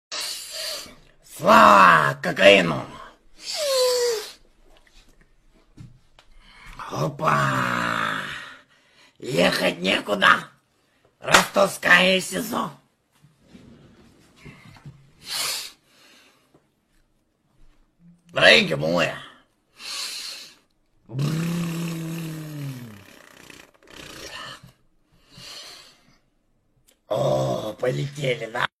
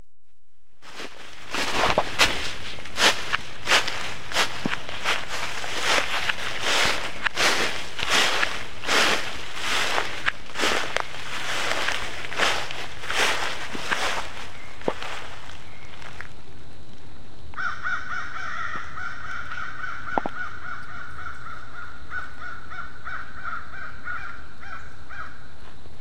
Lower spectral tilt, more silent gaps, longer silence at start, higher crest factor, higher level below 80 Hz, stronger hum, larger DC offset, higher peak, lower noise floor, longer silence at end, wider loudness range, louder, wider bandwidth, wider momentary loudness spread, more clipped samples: first, -3.5 dB/octave vs -1.5 dB/octave; neither; about the same, 0.1 s vs 0 s; about the same, 24 dB vs 28 dB; second, -56 dBFS vs -48 dBFS; neither; second, under 0.1% vs 6%; about the same, 0 dBFS vs 0 dBFS; about the same, -67 dBFS vs -68 dBFS; first, 0.15 s vs 0 s; first, 18 LU vs 13 LU; first, -20 LUFS vs -25 LUFS; about the same, 15.5 kHz vs 16 kHz; first, 24 LU vs 19 LU; neither